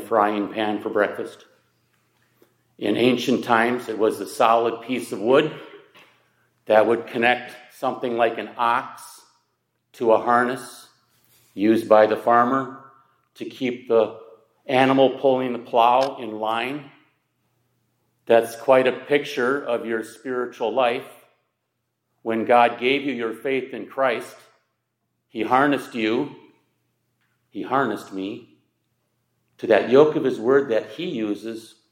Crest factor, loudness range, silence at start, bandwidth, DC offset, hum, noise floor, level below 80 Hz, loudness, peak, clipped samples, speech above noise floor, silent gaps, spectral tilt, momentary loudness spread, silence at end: 20 dB; 4 LU; 0 s; 16.5 kHz; under 0.1%; none; -76 dBFS; -74 dBFS; -21 LUFS; -2 dBFS; under 0.1%; 56 dB; none; -5.5 dB/octave; 16 LU; 0.25 s